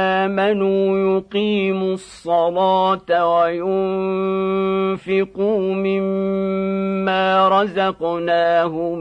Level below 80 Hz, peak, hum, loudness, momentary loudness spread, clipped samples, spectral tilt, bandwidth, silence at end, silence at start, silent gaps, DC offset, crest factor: -56 dBFS; -4 dBFS; none; -18 LUFS; 5 LU; under 0.1%; -7 dB/octave; 9.4 kHz; 0 s; 0 s; none; under 0.1%; 14 dB